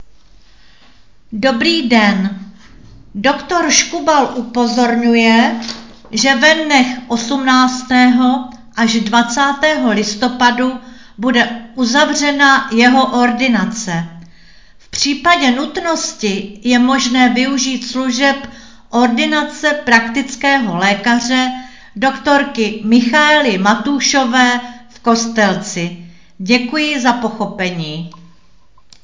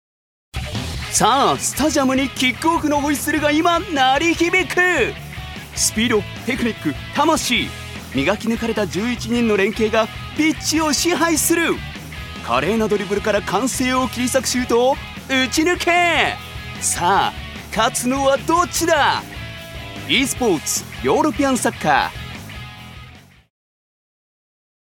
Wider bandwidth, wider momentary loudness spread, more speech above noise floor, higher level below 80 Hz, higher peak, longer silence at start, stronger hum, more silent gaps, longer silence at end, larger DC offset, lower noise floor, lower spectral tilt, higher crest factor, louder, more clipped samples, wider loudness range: second, 7.6 kHz vs 18 kHz; second, 11 LU vs 15 LU; first, 38 dB vs 24 dB; second, -50 dBFS vs -40 dBFS; about the same, 0 dBFS vs 0 dBFS; second, 0 s vs 0.55 s; neither; neither; second, 0.9 s vs 1.65 s; first, 0.8% vs under 0.1%; first, -51 dBFS vs -42 dBFS; about the same, -3 dB/octave vs -3 dB/octave; about the same, 14 dB vs 18 dB; first, -13 LUFS vs -18 LUFS; neither; about the same, 4 LU vs 3 LU